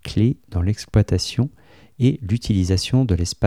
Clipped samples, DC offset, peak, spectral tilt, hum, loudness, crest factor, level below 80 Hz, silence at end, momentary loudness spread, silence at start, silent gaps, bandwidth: under 0.1%; 0.2%; -4 dBFS; -6.5 dB/octave; none; -21 LUFS; 16 dB; -36 dBFS; 0 s; 5 LU; 0.05 s; none; 13.5 kHz